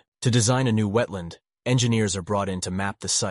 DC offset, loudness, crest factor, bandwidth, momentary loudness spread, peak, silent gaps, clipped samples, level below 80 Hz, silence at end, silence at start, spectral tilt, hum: under 0.1%; -24 LUFS; 16 dB; 11.5 kHz; 10 LU; -8 dBFS; none; under 0.1%; -54 dBFS; 0 s; 0.2 s; -4.5 dB/octave; none